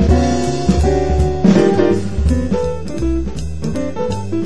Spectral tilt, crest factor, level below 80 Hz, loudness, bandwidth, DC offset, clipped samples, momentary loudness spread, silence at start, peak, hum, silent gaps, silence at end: -7 dB/octave; 14 dB; -22 dBFS; -16 LUFS; 11 kHz; 5%; under 0.1%; 10 LU; 0 s; 0 dBFS; none; none; 0 s